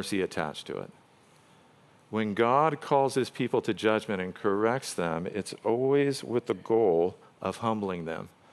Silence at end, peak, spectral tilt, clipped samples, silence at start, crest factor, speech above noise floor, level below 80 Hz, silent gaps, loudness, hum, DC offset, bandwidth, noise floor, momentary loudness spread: 0.25 s; -10 dBFS; -5.5 dB/octave; under 0.1%; 0 s; 20 dB; 31 dB; -70 dBFS; none; -29 LUFS; none; under 0.1%; 13 kHz; -59 dBFS; 11 LU